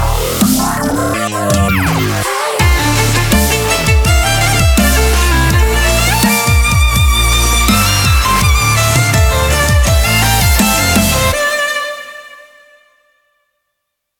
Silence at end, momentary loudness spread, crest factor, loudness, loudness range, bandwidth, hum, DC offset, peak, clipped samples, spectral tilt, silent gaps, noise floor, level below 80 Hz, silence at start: 1.85 s; 5 LU; 12 dB; -11 LUFS; 3 LU; 19 kHz; none; under 0.1%; 0 dBFS; under 0.1%; -4 dB/octave; none; -72 dBFS; -16 dBFS; 0 s